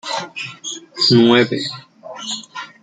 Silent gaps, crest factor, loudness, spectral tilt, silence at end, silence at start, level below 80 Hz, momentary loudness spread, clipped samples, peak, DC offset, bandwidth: none; 18 dB; -16 LUFS; -4.5 dB/octave; 0.15 s; 0.05 s; -58 dBFS; 20 LU; under 0.1%; 0 dBFS; under 0.1%; 9.4 kHz